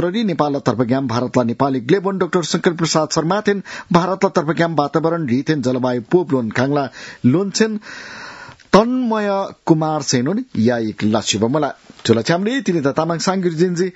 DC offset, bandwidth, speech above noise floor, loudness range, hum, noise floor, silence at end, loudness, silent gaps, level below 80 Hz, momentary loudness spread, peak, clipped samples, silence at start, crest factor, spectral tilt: under 0.1%; 8 kHz; 20 dB; 1 LU; none; -37 dBFS; 0.05 s; -18 LUFS; none; -56 dBFS; 5 LU; 0 dBFS; under 0.1%; 0 s; 18 dB; -5.5 dB/octave